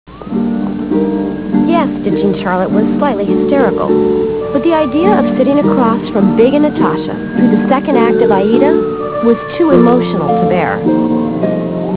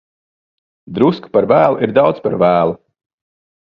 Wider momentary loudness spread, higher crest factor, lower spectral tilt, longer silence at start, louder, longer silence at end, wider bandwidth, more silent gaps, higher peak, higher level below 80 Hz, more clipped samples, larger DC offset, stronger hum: about the same, 6 LU vs 7 LU; about the same, 12 dB vs 16 dB; first, -11.5 dB/octave vs -9.5 dB/octave; second, 0.1 s vs 0.9 s; about the same, -12 LUFS vs -14 LUFS; second, 0 s vs 1.05 s; second, 4 kHz vs 5.6 kHz; neither; about the same, 0 dBFS vs 0 dBFS; first, -40 dBFS vs -52 dBFS; first, 0.1% vs under 0.1%; first, 0.4% vs under 0.1%; neither